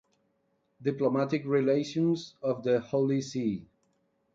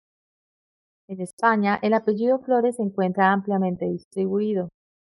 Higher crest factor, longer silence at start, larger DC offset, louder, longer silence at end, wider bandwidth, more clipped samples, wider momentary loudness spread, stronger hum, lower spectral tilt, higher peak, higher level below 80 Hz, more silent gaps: about the same, 16 dB vs 18 dB; second, 0.8 s vs 1.1 s; neither; second, -29 LUFS vs -23 LUFS; first, 0.75 s vs 0.4 s; second, 7.8 kHz vs 11.5 kHz; neither; second, 7 LU vs 10 LU; neither; about the same, -7 dB/octave vs -7.5 dB/octave; second, -14 dBFS vs -6 dBFS; about the same, -70 dBFS vs -68 dBFS; second, none vs 1.33-1.37 s, 4.04-4.11 s